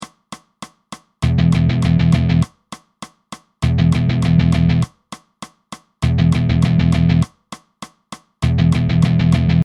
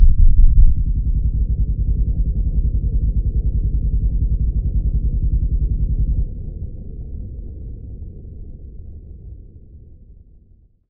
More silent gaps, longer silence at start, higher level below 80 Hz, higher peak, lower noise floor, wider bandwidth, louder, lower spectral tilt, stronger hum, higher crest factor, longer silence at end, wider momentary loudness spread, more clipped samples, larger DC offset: neither; about the same, 0 s vs 0 s; second, -28 dBFS vs -18 dBFS; about the same, -2 dBFS vs 0 dBFS; second, -40 dBFS vs -51 dBFS; first, 11 kHz vs 0.7 kHz; first, -16 LUFS vs -21 LUFS; second, -7.5 dB/octave vs -18 dB/octave; neither; about the same, 16 dB vs 16 dB; second, 0 s vs 0.95 s; about the same, 21 LU vs 21 LU; neither; neither